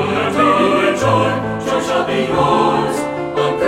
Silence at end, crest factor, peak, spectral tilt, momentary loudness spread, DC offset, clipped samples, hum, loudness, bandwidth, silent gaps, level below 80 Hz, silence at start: 0 s; 14 dB; -2 dBFS; -5.5 dB/octave; 6 LU; under 0.1%; under 0.1%; none; -15 LUFS; 16 kHz; none; -44 dBFS; 0 s